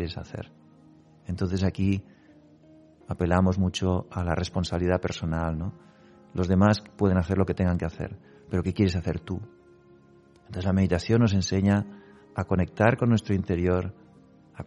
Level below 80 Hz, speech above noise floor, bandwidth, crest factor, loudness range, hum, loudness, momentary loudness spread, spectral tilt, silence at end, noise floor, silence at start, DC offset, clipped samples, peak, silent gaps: -46 dBFS; 31 dB; 10.5 kHz; 20 dB; 4 LU; none; -26 LUFS; 15 LU; -7 dB/octave; 0 s; -56 dBFS; 0 s; under 0.1%; under 0.1%; -6 dBFS; none